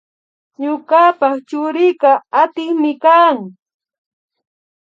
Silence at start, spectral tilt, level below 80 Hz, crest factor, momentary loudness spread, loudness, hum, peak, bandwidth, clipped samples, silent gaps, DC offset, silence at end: 0.6 s; -6 dB/octave; -80 dBFS; 14 dB; 11 LU; -14 LUFS; none; 0 dBFS; 7.6 kHz; under 0.1%; none; under 0.1%; 1.3 s